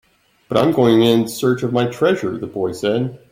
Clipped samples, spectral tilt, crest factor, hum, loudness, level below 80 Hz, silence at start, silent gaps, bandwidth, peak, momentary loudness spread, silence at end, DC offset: under 0.1%; -6 dB/octave; 16 dB; none; -17 LUFS; -54 dBFS; 0.5 s; none; 16.5 kHz; -2 dBFS; 9 LU; 0.15 s; under 0.1%